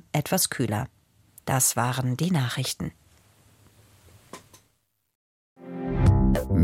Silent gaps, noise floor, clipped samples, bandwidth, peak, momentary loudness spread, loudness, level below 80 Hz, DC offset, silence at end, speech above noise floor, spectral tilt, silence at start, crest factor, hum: 5.15-5.56 s; -71 dBFS; under 0.1%; 16.5 kHz; -8 dBFS; 20 LU; -25 LUFS; -36 dBFS; under 0.1%; 0 s; 46 dB; -4.5 dB/octave; 0.15 s; 20 dB; none